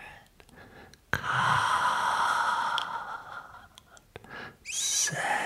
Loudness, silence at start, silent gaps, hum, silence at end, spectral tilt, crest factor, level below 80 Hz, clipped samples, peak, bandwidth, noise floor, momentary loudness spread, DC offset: -28 LUFS; 0 s; none; none; 0 s; -1 dB/octave; 22 dB; -62 dBFS; under 0.1%; -8 dBFS; 16 kHz; -55 dBFS; 18 LU; under 0.1%